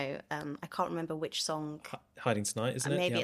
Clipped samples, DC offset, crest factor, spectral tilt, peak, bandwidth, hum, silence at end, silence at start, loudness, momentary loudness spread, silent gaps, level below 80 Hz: under 0.1%; under 0.1%; 22 dB; -4 dB/octave; -14 dBFS; 15 kHz; none; 0 s; 0 s; -35 LUFS; 8 LU; none; -72 dBFS